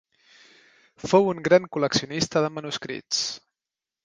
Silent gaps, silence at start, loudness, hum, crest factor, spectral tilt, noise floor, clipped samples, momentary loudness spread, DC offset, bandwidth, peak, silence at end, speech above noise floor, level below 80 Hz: none; 1.05 s; -24 LUFS; none; 22 dB; -4 dB/octave; -90 dBFS; under 0.1%; 11 LU; under 0.1%; 10 kHz; -4 dBFS; 0.65 s; 66 dB; -60 dBFS